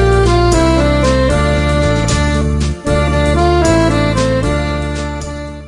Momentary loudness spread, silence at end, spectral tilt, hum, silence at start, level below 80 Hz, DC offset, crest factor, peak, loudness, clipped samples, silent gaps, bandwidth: 8 LU; 0 s; -6 dB/octave; none; 0 s; -20 dBFS; under 0.1%; 12 dB; 0 dBFS; -13 LUFS; under 0.1%; none; 11.5 kHz